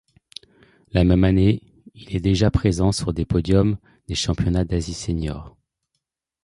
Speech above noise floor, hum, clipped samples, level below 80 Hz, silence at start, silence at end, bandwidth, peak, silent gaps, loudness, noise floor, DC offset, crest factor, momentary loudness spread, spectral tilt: 59 dB; none; under 0.1%; -32 dBFS; 0.95 s; 0.95 s; 11.5 kHz; -4 dBFS; none; -21 LUFS; -78 dBFS; under 0.1%; 18 dB; 15 LU; -6.5 dB/octave